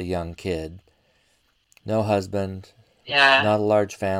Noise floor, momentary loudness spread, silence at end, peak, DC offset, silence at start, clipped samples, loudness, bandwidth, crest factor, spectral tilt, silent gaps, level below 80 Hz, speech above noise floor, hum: -65 dBFS; 19 LU; 0 s; -2 dBFS; under 0.1%; 0 s; under 0.1%; -21 LUFS; 15.5 kHz; 22 dB; -5 dB/octave; none; -52 dBFS; 43 dB; none